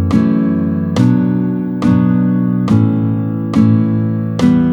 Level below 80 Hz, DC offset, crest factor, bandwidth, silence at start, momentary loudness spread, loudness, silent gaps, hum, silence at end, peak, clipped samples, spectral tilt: -42 dBFS; under 0.1%; 12 dB; 9.2 kHz; 0 s; 4 LU; -13 LUFS; none; none; 0 s; 0 dBFS; under 0.1%; -9 dB/octave